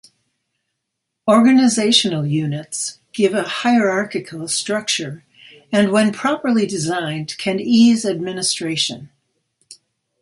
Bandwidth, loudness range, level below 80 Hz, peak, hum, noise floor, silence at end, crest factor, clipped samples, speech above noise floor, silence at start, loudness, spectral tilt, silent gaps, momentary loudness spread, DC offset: 11.5 kHz; 3 LU; -64 dBFS; 0 dBFS; none; -78 dBFS; 0.45 s; 18 dB; under 0.1%; 61 dB; 1.25 s; -17 LUFS; -4 dB/octave; none; 12 LU; under 0.1%